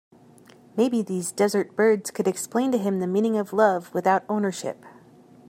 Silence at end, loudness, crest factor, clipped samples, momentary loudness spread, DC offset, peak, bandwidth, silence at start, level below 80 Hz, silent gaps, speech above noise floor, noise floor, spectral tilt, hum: 0.6 s; -24 LUFS; 18 dB; under 0.1%; 7 LU; under 0.1%; -6 dBFS; 16 kHz; 0.75 s; -74 dBFS; none; 29 dB; -52 dBFS; -5.5 dB/octave; none